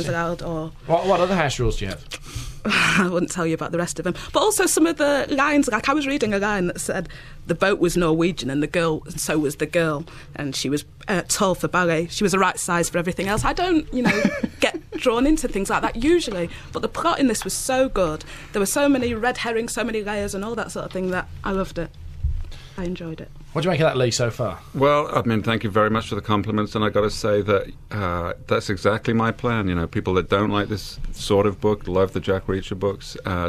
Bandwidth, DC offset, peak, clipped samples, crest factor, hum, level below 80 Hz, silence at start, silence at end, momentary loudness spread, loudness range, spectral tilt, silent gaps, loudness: 14.5 kHz; under 0.1%; -4 dBFS; under 0.1%; 18 dB; none; -38 dBFS; 0 s; 0 s; 11 LU; 4 LU; -4.5 dB/octave; none; -22 LUFS